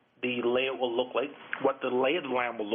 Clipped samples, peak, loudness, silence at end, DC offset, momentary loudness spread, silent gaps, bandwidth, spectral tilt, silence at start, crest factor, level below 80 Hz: under 0.1%; -14 dBFS; -30 LUFS; 0 s; under 0.1%; 5 LU; none; 3.7 kHz; -2 dB/octave; 0.2 s; 16 dB; -76 dBFS